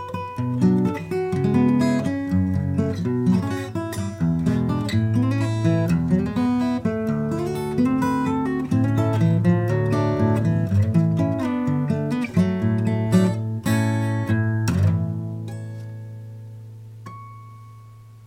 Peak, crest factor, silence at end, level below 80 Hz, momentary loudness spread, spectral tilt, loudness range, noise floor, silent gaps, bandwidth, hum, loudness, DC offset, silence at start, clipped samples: -6 dBFS; 16 dB; 0 s; -48 dBFS; 15 LU; -8 dB/octave; 4 LU; -44 dBFS; none; 15.5 kHz; none; -22 LUFS; under 0.1%; 0 s; under 0.1%